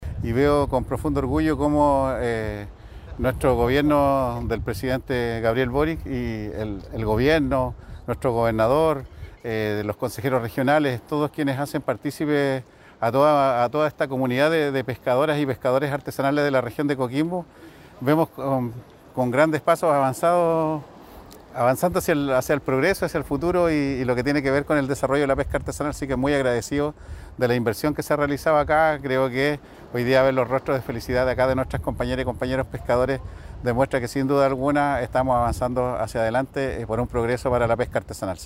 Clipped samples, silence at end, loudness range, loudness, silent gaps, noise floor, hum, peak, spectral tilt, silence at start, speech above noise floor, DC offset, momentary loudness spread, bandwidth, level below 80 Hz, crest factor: under 0.1%; 0 s; 2 LU; -23 LUFS; none; -44 dBFS; none; -4 dBFS; -6.5 dB/octave; 0 s; 22 dB; under 0.1%; 9 LU; 16 kHz; -40 dBFS; 18 dB